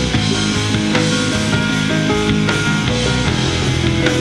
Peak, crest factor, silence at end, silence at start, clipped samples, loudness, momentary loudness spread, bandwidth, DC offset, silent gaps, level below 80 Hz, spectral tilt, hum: -2 dBFS; 14 dB; 0 s; 0 s; under 0.1%; -16 LUFS; 1 LU; 13 kHz; under 0.1%; none; -30 dBFS; -4.5 dB/octave; none